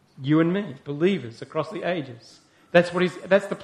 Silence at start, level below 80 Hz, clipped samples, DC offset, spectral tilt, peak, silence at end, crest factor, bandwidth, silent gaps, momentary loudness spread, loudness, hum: 0.2 s; -66 dBFS; under 0.1%; under 0.1%; -7 dB/octave; -2 dBFS; 0 s; 22 dB; 11 kHz; none; 10 LU; -24 LUFS; none